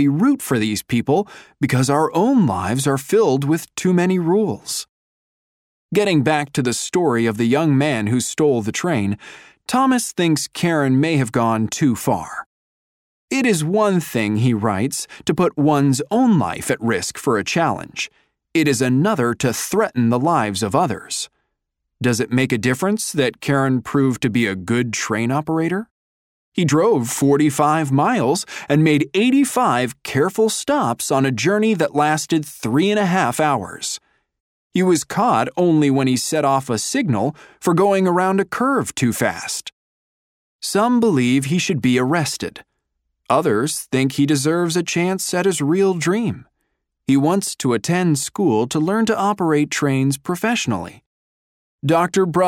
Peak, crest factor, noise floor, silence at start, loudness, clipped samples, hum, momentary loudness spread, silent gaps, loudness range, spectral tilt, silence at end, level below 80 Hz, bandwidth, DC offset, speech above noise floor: -2 dBFS; 16 dB; -77 dBFS; 0 s; -18 LUFS; under 0.1%; none; 7 LU; 4.89-5.89 s, 12.46-13.28 s, 25.91-26.52 s, 34.40-34.70 s, 39.72-40.59 s, 51.06-51.79 s; 2 LU; -5 dB/octave; 0 s; -58 dBFS; 17 kHz; under 0.1%; 59 dB